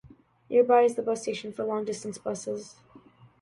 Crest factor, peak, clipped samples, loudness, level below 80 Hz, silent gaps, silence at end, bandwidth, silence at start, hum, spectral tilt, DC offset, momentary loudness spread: 20 dB; -8 dBFS; under 0.1%; -27 LUFS; -70 dBFS; none; 0.7 s; 11.5 kHz; 0.05 s; none; -4.5 dB/octave; under 0.1%; 14 LU